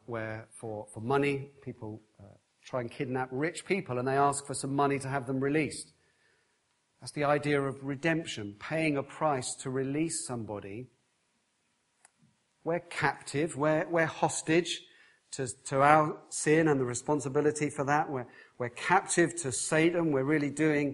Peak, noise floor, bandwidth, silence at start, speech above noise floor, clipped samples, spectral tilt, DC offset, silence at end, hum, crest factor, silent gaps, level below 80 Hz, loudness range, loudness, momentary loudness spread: -8 dBFS; -75 dBFS; 11.5 kHz; 0.1 s; 45 dB; under 0.1%; -5 dB/octave; under 0.1%; 0 s; none; 24 dB; none; -68 dBFS; 7 LU; -30 LUFS; 14 LU